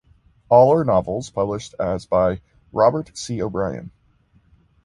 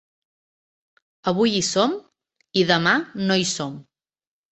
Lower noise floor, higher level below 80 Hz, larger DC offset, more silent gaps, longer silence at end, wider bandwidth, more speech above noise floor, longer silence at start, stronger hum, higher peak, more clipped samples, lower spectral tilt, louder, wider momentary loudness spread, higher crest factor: second, -58 dBFS vs under -90 dBFS; first, -46 dBFS vs -62 dBFS; neither; neither; first, 0.95 s vs 0.7 s; first, 11.5 kHz vs 8.4 kHz; second, 39 dB vs over 69 dB; second, 0.5 s vs 1.25 s; neither; about the same, -2 dBFS vs -2 dBFS; neither; first, -6.5 dB/octave vs -3.5 dB/octave; about the same, -20 LUFS vs -21 LUFS; about the same, 14 LU vs 12 LU; about the same, 18 dB vs 22 dB